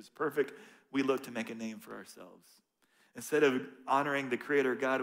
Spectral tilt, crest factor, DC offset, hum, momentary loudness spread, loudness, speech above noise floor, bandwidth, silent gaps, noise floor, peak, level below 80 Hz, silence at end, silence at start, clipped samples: -4.5 dB/octave; 20 dB; under 0.1%; none; 19 LU; -33 LUFS; 35 dB; 16 kHz; none; -69 dBFS; -14 dBFS; -84 dBFS; 0 s; 0 s; under 0.1%